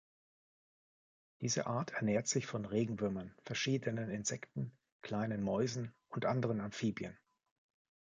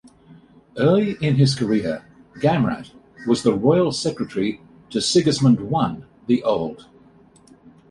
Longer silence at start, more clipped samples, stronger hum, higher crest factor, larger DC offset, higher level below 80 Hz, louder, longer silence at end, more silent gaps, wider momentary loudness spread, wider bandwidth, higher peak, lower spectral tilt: first, 1.4 s vs 0.3 s; neither; neither; about the same, 18 dB vs 18 dB; neither; second, -70 dBFS vs -54 dBFS; second, -38 LUFS vs -20 LUFS; second, 0.9 s vs 1.1 s; first, 4.92-5.00 s vs none; second, 9 LU vs 13 LU; second, 9.4 kHz vs 11.5 kHz; second, -20 dBFS vs -4 dBFS; about the same, -5 dB/octave vs -6 dB/octave